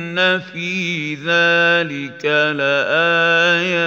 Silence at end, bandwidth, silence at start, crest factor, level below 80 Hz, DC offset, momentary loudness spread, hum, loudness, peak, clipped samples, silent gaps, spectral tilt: 0 s; 7.8 kHz; 0 s; 14 dB; -70 dBFS; under 0.1%; 9 LU; none; -16 LUFS; -2 dBFS; under 0.1%; none; -4.5 dB/octave